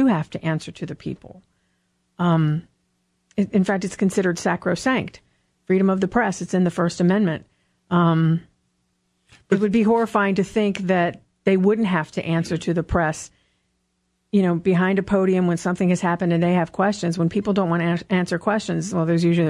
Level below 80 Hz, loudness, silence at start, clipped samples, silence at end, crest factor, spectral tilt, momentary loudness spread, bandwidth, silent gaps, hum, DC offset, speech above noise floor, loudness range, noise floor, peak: -50 dBFS; -21 LUFS; 0 s; under 0.1%; 0 s; 16 dB; -7 dB/octave; 7 LU; 11.5 kHz; none; none; under 0.1%; 51 dB; 3 LU; -71 dBFS; -6 dBFS